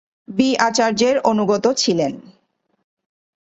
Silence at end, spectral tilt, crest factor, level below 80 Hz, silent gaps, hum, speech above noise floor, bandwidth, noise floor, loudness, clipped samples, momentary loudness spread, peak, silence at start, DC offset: 1.2 s; -4 dB/octave; 18 dB; -60 dBFS; none; none; 48 dB; 8.2 kHz; -65 dBFS; -18 LUFS; under 0.1%; 8 LU; -2 dBFS; 0.3 s; under 0.1%